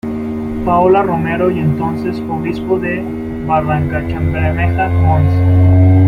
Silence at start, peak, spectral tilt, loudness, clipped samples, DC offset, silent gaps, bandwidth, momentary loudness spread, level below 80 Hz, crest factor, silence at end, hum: 0.05 s; -2 dBFS; -10 dB/octave; -14 LUFS; under 0.1%; under 0.1%; none; 4.8 kHz; 9 LU; -32 dBFS; 12 dB; 0 s; none